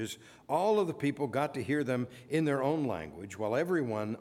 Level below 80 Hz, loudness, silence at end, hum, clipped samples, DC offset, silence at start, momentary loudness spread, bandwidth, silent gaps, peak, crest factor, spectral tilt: -68 dBFS; -32 LUFS; 0 s; none; under 0.1%; under 0.1%; 0 s; 9 LU; 16 kHz; none; -16 dBFS; 16 dB; -6.5 dB/octave